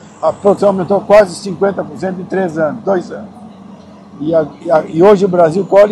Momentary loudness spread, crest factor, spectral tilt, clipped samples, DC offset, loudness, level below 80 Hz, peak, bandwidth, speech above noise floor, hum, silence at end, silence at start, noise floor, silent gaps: 12 LU; 12 dB; -7 dB/octave; 0.5%; under 0.1%; -13 LUFS; -50 dBFS; 0 dBFS; 11 kHz; 24 dB; none; 0 s; 0.05 s; -35 dBFS; none